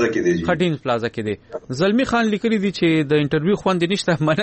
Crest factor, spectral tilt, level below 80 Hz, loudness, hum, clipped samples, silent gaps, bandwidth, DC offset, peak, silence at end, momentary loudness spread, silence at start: 12 dB; -6 dB/octave; -50 dBFS; -19 LUFS; none; under 0.1%; none; 8.8 kHz; under 0.1%; -6 dBFS; 0 s; 7 LU; 0 s